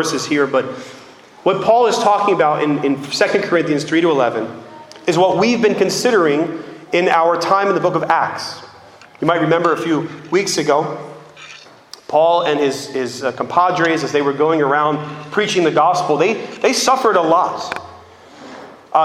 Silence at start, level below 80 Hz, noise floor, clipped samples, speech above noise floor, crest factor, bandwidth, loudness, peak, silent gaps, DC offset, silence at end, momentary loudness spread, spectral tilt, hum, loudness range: 0 s; -64 dBFS; -42 dBFS; under 0.1%; 26 dB; 16 dB; 15 kHz; -16 LUFS; 0 dBFS; none; under 0.1%; 0 s; 15 LU; -4.5 dB/octave; none; 3 LU